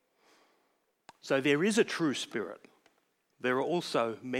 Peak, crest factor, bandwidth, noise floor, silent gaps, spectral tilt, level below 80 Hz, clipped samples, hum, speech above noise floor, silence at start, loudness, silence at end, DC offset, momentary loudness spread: -14 dBFS; 20 dB; 16 kHz; -75 dBFS; none; -4.5 dB/octave; -90 dBFS; under 0.1%; none; 45 dB; 1.25 s; -31 LUFS; 0 s; under 0.1%; 14 LU